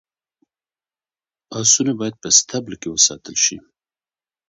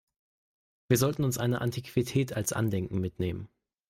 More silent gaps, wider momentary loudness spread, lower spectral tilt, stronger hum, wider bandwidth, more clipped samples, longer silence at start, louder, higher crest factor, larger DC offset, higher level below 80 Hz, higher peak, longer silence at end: neither; first, 12 LU vs 8 LU; second, -1.5 dB/octave vs -5.5 dB/octave; neither; second, 8.6 kHz vs 16 kHz; neither; first, 1.5 s vs 0.9 s; first, -16 LUFS vs -30 LUFS; about the same, 22 dB vs 20 dB; neither; about the same, -60 dBFS vs -58 dBFS; first, 0 dBFS vs -12 dBFS; first, 0.9 s vs 0.45 s